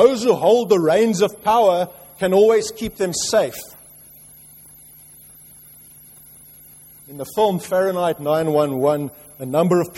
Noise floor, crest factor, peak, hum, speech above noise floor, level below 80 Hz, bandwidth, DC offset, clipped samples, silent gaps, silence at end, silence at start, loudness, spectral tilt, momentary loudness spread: -45 dBFS; 18 dB; -2 dBFS; none; 27 dB; -56 dBFS; 16.5 kHz; under 0.1%; under 0.1%; none; 0.1 s; 0 s; -18 LUFS; -5 dB/octave; 13 LU